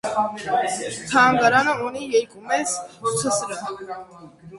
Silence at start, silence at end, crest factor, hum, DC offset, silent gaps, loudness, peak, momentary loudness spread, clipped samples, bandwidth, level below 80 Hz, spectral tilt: 0.05 s; 0 s; 18 dB; none; under 0.1%; none; -21 LUFS; -4 dBFS; 14 LU; under 0.1%; 11.5 kHz; -60 dBFS; -3 dB/octave